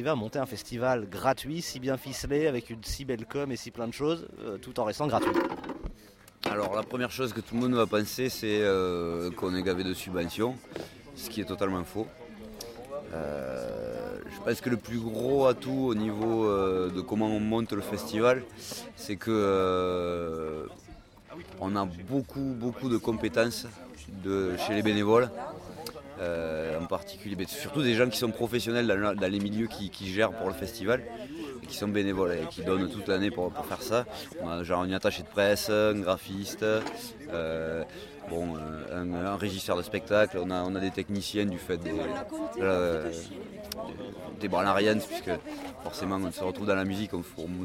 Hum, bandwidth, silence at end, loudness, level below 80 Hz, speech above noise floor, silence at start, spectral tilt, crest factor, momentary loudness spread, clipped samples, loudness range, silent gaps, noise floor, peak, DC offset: none; 16.5 kHz; 0 s; -30 LUFS; -54 dBFS; 24 dB; 0 s; -5.5 dB/octave; 20 dB; 13 LU; under 0.1%; 4 LU; none; -54 dBFS; -10 dBFS; under 0.1%